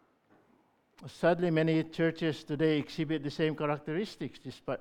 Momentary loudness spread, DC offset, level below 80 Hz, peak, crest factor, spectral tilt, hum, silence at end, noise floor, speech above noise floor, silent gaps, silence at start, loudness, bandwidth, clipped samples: 14 LU; under 0.1%; -66 dBFS; -14 dBFS; 18 dB; -7 dB/octave; none; 0 s; -68 dBFS; 37 dB; none; 1 s; -32 LUFS; 11.5 kHz; under 0.1%